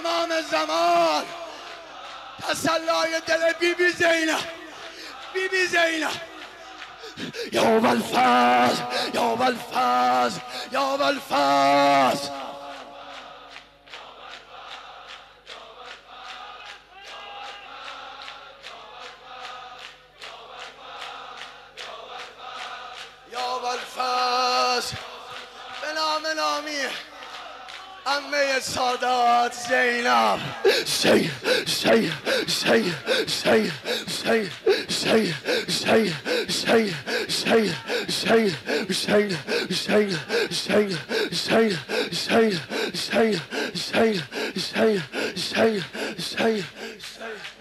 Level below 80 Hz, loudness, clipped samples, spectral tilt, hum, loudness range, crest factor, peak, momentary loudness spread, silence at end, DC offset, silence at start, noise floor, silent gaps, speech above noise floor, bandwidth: -64 dBFS; -22 LUFS; under 0.1%; -3.5 dB/octave; 50 Hz at -65 dBFS; 18 LU; 16 dB; -8 dBFS; 20 LU; 0.05 s; under 0.1%; 0 s; -46 dBFS; none; 23 dB; 16 kHz